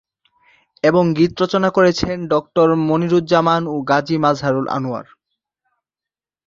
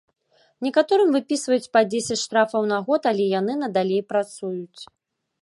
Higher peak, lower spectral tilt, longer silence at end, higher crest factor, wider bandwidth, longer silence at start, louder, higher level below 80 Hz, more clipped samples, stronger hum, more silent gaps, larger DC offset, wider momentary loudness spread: first, 0 dBFS vs -4 dBFS; first, -6.5 dB/octave vs -4.5 dB/octave; first, 1.45 s vs 0.55 s; about the same, 16 dB vs 18 dB; second, 7.6 kHz vs 11.5 kHz; first, 0.85 s vs 0.6 s; first, -17 LUFS vs -22 LUFS; first, -50 dBFS vs -72 dBFS; neither; neither; neither; neither; second, 6 LU vs 11 LU